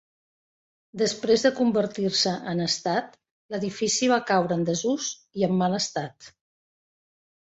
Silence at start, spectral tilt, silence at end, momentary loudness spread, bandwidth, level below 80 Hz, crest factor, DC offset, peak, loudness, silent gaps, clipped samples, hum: 0.95 s; -4 dB/octave; 1.15 s; 10 LU; 8.2 kHz; -66 dBFS; 18 dB; under 0.1%; -8 dBFS; -25 LUFS; 3.31-3.49 s; under 0.1%; none